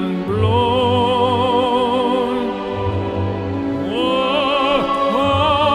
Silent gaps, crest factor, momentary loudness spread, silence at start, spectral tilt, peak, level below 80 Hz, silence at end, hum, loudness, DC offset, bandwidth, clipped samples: none; 14 dB; 6 LU; 0 s; -6.5 dB/octave; -2 dBFS; -42 dBFS; 0 s; none; -17 LUFS; under 0.1%; 11.5 kHz; under 0.1%